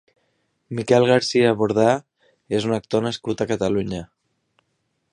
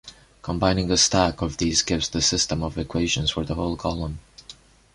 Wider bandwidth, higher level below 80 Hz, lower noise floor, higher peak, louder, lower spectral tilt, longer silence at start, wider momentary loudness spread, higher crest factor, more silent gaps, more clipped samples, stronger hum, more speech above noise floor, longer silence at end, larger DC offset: about the same, 10.5 kHz vs 11.5 kHz; second, -54 dBFS vs -38 dBFS; first, -72 dBFS vs -48 dBFS; about the same, -2 dBFS vs -4 dBFS; about the same, -20 LUFS vs -22 LUFS; first, -5.5 dB/octave vs -3.5 dB/octave; first, 0.7 s vs 0.05 s; about the same, 12 LU vs 13 LU; about the same, 20 dB vs 20 dB; neither; neither; neither; first, 52 dB vs 25 dB; first, 1.1 s vs 0.45 s; neither